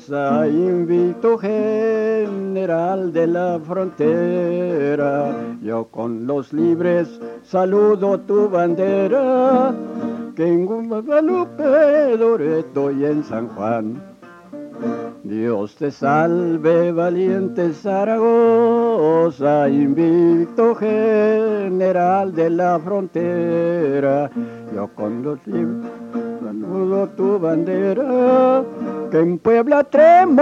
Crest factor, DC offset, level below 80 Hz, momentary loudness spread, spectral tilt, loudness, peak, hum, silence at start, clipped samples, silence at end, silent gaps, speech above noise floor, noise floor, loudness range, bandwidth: 16 dB; under 0.1%; -68 dBFS; 11 LU; -9 dB/octave; -18 LUFS; -2 dBFS; none; 0.1 s; under 0.1%; 0 s; none; 21 dB; -38 dBFS; 6 LU; 7.2 kHz